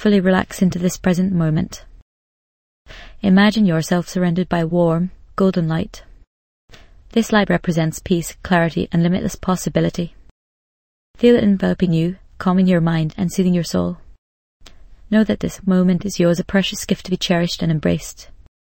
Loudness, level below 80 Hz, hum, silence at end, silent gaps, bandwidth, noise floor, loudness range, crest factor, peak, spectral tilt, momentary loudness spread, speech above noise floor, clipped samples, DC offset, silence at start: -18 LUFS; -42 dBFS; none; 0.4 s; 2.02-2.85 s, 6.27-6.68 s, 10.31-11.14 s, 14.18-14.60 s; 16.5 kHz; -41 dBFS; 3 LU; 18 dB; 0 dBFS; -6 dB/octave; 8 LU; 24 dB; under 0.1%; under 0.1%; 0 s